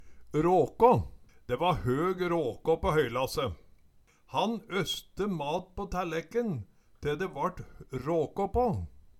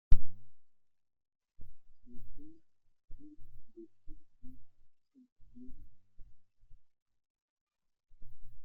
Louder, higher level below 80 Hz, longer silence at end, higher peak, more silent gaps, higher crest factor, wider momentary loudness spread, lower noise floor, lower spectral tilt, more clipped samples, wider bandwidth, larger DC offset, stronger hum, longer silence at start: first, -30 LUFS vs -50 LUFS; second, -48 dBFS vs -42 dBFS; first, 0.3 s vs 0 s; about the same, -8 dBFS vs -8 dBFS; second, none vs 5.32-5.36 s, 7.02-7.06 s, 7.30-7.35 s, 7.42-7.67 s; about the same, 22 dB vs 24 dB; about the same, 11 LU vs 11 LU; about the same, -61 dBFS vs -58 dBFS; second, -6 dB/octave vs -9 dB/octave; neither; first, 17 kHz vs 0.7 kHz; neither; neither; about the same, 0 s vs 0.1 s